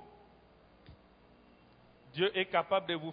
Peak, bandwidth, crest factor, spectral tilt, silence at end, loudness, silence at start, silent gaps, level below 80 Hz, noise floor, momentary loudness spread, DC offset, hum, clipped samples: -16 dBFS; 5 kHz; 22 dB; -2 dB/octave; 0 s; -33 LUFS; 0 s; none; -70 dBFS; -62 dBFS; 5 LU; under 0.1%; none; under 0.1%